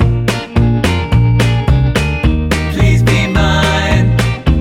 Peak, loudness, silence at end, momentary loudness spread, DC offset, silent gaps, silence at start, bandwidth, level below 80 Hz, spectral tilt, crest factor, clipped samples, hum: 0 dBFS; -12 LUFS; 0 s; 4 LU; under 0.1%; none; 0 s; 14 kHz; -18 dBFS; -6 dB/octave; 10 dB; under 0.1%; none